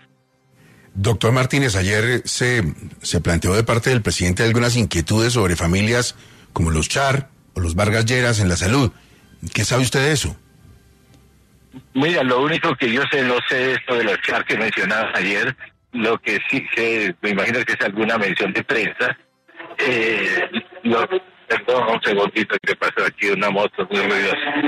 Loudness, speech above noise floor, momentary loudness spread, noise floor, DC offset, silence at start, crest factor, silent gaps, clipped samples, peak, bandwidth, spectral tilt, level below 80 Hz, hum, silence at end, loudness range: -19 LUFS; 40 dB; 6 LU; -59 dBFS; under 0.1%; 0.95 s; 16 dB; none; under 0.1%; -4 dBFS; 14 kHz; -4.5 dB/octave; -44 dBFS; none; 0 s; 2 LU